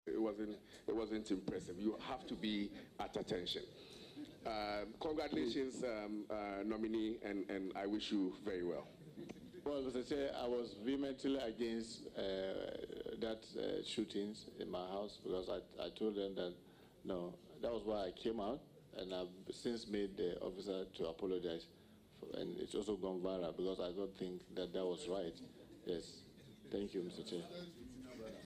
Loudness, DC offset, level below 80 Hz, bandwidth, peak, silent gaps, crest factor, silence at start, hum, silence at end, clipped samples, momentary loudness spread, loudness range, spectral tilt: -44 LUFS; under 0.1%; -68 dBFS; 14 kHz; -28 dBFS; none; 16 dB; 0.05 s; none; 0 s; under 0.1%; 11 LU; 3 LU; -5.5 dB/octave